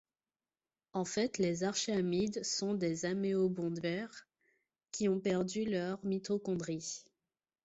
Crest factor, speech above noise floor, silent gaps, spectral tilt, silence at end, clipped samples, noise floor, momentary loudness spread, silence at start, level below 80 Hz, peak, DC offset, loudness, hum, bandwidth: 16 dB; over 55 dB; none; -5 dB/octave; 0.65 s; under 0.1%; under -90 dBFS; 8 LU; 0.95 s; -72 dBFS; -20 dBFS; under 0.1%; -36 LUFS; none; 8.2 kHz